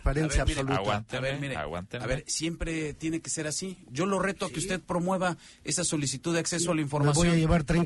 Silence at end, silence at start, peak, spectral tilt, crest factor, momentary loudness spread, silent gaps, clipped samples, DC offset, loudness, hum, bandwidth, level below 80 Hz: 0 s; 0 s; -12 dBFS; -4.5 dB/octave; 16 dB; 9 LU; none; under 0.1%; under 0.1%; -29 LUFS; none; 11.5 kHz; -40 dBFS